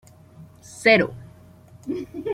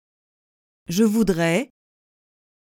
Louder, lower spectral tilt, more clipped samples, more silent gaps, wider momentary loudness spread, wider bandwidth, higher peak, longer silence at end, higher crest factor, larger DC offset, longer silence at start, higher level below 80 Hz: about the same, -21 LUFS vs -21 LUFS; about the same, -5 dB/octave vs -5.5 dB/octave; neither; neither; first, 25 LU vs 9 LU; second, 15 kHz vs 17 kHz; about the same, -4 dBFS vs -6 dBFS; second, 0 s vs 1 s; about the same, 22 dB vs 18 dB; neither; second, 0.4 s vs 0.9 s; second, -60 dBFS vs -50 dBFS